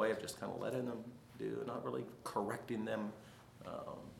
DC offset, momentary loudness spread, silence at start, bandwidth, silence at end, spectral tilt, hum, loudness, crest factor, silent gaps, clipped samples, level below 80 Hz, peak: under 0.1%; 10 LU; 0 s; 17 kHz; 0 s; -5.5 dB/octave; none; -43 LUFS; 20 dB; none; under 0.1%; -74 dBFS; -22 dBFS